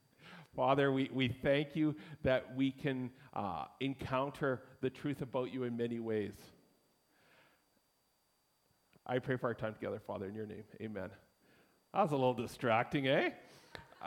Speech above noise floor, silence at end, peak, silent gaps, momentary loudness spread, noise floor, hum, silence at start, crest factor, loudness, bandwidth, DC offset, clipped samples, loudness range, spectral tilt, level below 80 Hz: 41 dB; 0 s; -18 dBFS; none; 15 LU; -77 dBFS; none; 0.2 s; 22 dB; -37 LUFS; 16 kHz; under 0.1%; under 0.1%; 9 LU; -7 dB/octave; -68 dBFS